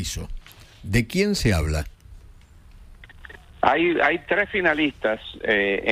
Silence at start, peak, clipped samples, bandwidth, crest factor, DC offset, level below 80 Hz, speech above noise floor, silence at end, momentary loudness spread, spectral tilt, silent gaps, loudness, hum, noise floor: 0 s; -4 dBFS; under 0.1%; 16 kHz; 20 dB; under 0.1%; -38 dBFS; 25 dB; 0 s; 19 LU; -5 dB/octave; none; -22 LUFS; none; -48 dBFS